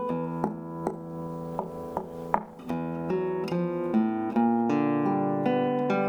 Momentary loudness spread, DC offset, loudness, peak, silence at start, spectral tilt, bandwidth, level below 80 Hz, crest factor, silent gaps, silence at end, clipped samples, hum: 10 LU; under 0.1%; -29 LUFS; -6 dBFS; 0 s; -8.5 dB/octave; 9.2 kHz; -62 dBFS; 22 dB; none; 0 s; under 0.1%; none